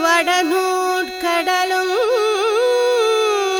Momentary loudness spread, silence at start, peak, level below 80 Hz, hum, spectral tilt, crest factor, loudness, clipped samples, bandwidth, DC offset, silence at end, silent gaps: 3 LU; 0 s; -2 dBFS; -58 dBFS; none; 0 dB/octave; 14 dB; -17 LUFS; under 0.1%; over 20 kHz; under 0.1%; 0 s; none